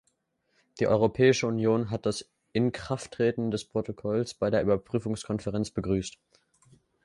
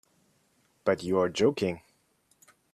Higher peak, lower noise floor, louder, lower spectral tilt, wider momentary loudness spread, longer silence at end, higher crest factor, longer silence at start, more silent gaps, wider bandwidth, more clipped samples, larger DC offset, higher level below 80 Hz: about the same, -10 dBFS vs -12 dBFS; first, -74 dBFS vs -69 dBFS; about the same, -28 LUFS vs -28 LUFS; about the same, -6 dB/octave vs -5.5 dB/octave; first, 10 LU vs 7 LU; about the same, 0.95 s vs 0.95 s; about the same, 20 dB vs 20 dB; about the same, 0.75 s vs 0.85 s; neither; second, 11.5 kHz vs 13.5 kHz; neither; neither; first, -54 dBFS vs -68 dBFS